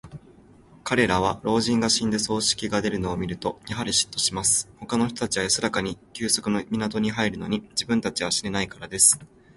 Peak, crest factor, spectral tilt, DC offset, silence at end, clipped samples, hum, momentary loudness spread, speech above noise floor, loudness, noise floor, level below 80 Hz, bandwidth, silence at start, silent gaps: -2 dBFS; 22 dB; -3 dB/octave; under 0.1%; 0.3 s; under 0.1%; none; 9 LU; 27 dB; -23 LUFS; -52 dBFS; -50 dBFS; 12 kHz; 0.05 s; none